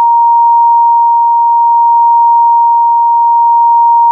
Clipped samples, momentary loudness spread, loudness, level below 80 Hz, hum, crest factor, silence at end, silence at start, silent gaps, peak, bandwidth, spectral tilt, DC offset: under 0.1%; 1 LU; -7 LUFS; under -90 dBFS; none; 4 dB; 0 s; 0 s; none; -2 dBFS; 1.1 kHz; 8 dB/octave; under 0.1%